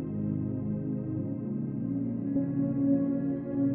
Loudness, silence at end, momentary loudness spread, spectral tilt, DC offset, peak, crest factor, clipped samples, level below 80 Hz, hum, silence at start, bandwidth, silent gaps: -31 LUFS; 0 s; 7 LU; -13.5 dB/octave; under 0.1%; -16 dBFS; 14 dB; under 0.1%; -58 dBFS; none; 0 s; 2.7 kHz; none